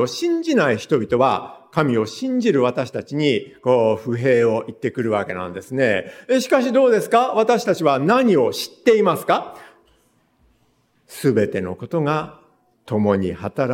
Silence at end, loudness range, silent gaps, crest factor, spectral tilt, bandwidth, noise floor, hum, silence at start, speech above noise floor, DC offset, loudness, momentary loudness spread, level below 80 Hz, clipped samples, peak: 0 s; 6 LU; none; 16 dB; -6 dB/octave; 17 kHz; -62 dBFS; none; 0 s; 43 dB; under 0.1%; -19 LUFS; 10 LU; -60 dBFS; under 0.1%; -2 dBFS